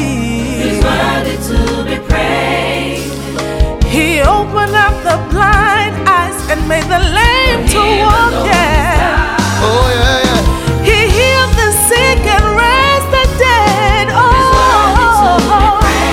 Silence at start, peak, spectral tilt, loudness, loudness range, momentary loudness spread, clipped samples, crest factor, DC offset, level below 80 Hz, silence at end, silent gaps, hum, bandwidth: 0 s; 0 dBFS; -4 dB/octave; -10 LUFS; 5 LU; 7 LU; 0.1%; 10 dB; under 0.1%; -18 dBFS; 0 s; none; none; 16.5 kHz